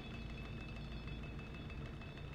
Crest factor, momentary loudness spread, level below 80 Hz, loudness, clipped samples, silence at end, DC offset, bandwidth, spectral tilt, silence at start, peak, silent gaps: 12 dB; 1 LU; -52 dBFS; -49 LUFS; under 0.1%; 0 s; under 0.1%; 9.8 kHz; -6.5 dB/octave; 0 s; -36 dBFS; none